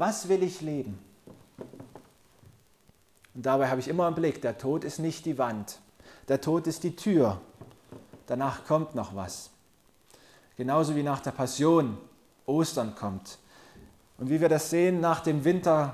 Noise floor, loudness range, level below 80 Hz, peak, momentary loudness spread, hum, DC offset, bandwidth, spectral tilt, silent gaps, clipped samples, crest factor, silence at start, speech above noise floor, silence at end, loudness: -64 dBFS; 6 LU; -62 dBFS; -12 dBFS; 22 LU; none; under 0.1%; 15.5 kHz; -6 dB/octave; none; under 0.1%; 18 dB; 0 s; 37 dB; 0 s; -28 LUFS